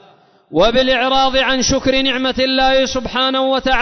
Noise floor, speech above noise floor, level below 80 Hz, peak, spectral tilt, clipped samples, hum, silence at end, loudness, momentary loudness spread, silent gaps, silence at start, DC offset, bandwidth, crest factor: -49 dBFS; 34 dB; -34 dBFS; -2 dBFS; -3 dB/octave; under 0.1%; none; 0 s; -14 LUFS; 3 LU; none; 0.5 s; under 0.1%; 6.4 kHz; 12 dB